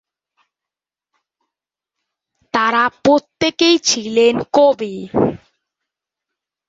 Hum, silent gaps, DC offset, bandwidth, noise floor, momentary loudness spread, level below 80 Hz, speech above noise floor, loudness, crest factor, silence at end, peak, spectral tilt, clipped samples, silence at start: none; none; under 0.1%; 7.8 kHz; -88 dBFS; 7 LU; -54 dBFS; 73 dB; -15 LUFS; 18 dB; 1.3 s; -2 dBFS; -3.5 dB/octave; under 0.1%; 2.55 s